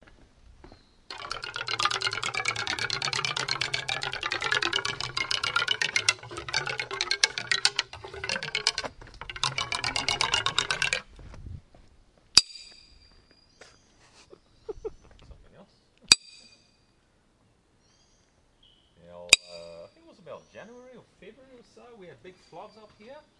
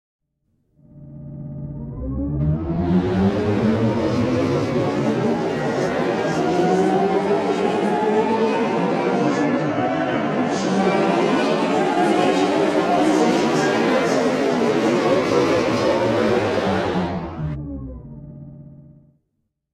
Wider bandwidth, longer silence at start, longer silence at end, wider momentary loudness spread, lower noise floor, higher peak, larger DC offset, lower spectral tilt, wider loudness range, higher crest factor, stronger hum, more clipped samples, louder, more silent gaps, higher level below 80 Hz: about the same, 12 kHz vs 13 kHz; second, 0.1 s vs 0.95 s; second, 0.2 s vs 0.8 s; first, 26 LU vs 12 LU; second, -66 dBFS vs -74 dBFS; first, 0 dBFS vs -4 dBFS; neither; second, 0 dB/octave vs -6.5 dB/octave; about the same, 3 LU vs 5 LU; first, 32 dB vs 16 dB; neither; neither; second, -26 LUFS vs -19 LUFS; neither; second, -56 dBFS vs -42 dBFS